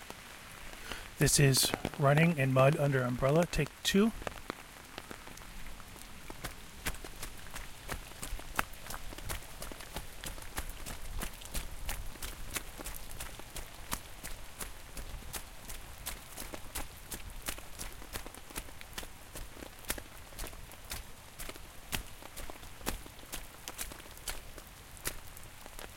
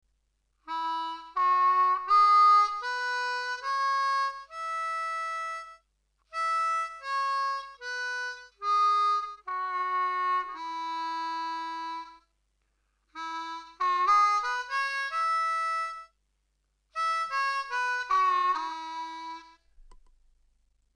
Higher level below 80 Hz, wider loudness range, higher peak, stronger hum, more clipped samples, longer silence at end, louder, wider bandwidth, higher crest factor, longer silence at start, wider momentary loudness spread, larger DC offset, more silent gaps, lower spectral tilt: first, -48 dBFS vs -68 dBFS; first, 15 LU vs 8 LU; first, -8 dBFS vs -14 dBFS; neither; neither; second, 0 s vs 1 s; second, -36 LUFS vs -28 LUFS; first, 17 kHz vs 10.5 kHz; first, 28 dB vs 16 dB; second, 0 s vs 0.65 s; first, 19 LU vs 15 LU; neither; neither; first, -4 dB/octave vs 0.5 dB/octave